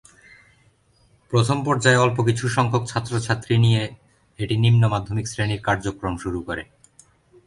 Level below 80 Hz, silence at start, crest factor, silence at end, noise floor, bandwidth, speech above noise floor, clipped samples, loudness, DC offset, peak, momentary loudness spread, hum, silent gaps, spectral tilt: -46 dBFS; 1.3 s; 18 dB; 0.85 s; -59 dBFS; 11.5 kHz; 39 dB; under 0.1%; -21 LUFS; under 0.1%; -4 dBFS; 11 LU; none; none; -5.5 dB/octave